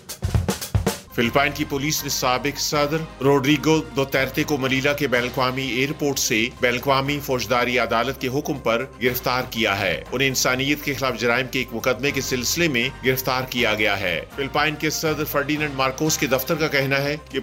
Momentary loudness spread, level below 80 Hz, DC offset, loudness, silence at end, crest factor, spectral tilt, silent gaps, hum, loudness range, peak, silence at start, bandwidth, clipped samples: 5 LU; -42 dBFS; under 0.1%; -21 LUFS; 0 s; 18 dB; -4 dB/octave; none; none; 1 LU; -4 dBFS; 0.05 s; 16.5 kHz; under 0.1%